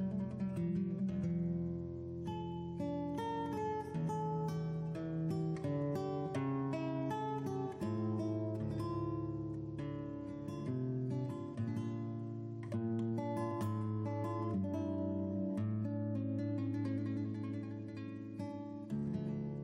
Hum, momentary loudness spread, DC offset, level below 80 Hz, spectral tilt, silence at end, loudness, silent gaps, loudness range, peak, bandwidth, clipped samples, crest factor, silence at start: none; 6 LU; under 0.1%; -64 dBFS; -9 dB/octave; 0 s; -40 LUFS; none; 2 LU; -28 dBFS; 11.5 kHz; under 0.1%; 10 dB; 0 s